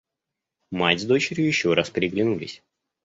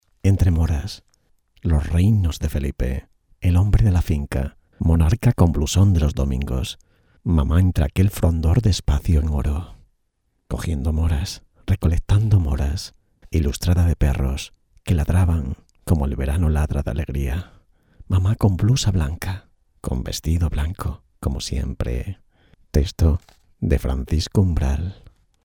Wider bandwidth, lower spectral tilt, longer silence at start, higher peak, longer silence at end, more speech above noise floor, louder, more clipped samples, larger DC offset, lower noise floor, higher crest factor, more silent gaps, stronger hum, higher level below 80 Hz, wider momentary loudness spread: second, 8 kHz vs 16.5 kHz; second, -5 dB/octave vs -6.5 dB/octave; first, 0.7 s vs 0.25 s; about the same, -4 dBFS vs -2 dBFS; about the same, 0.5 s vs 0.5 s; first, 62 dB vs 50 dB; about the same, -22 LUFS vs -21 LUFS; neither; neither; first, -85 dBFS vs -69 dBFS; about the same, 22 dB vs 18 dB; neither; neither; second, -58 dBFS vs -26 dBFS; second, 10 LU vs 13 LU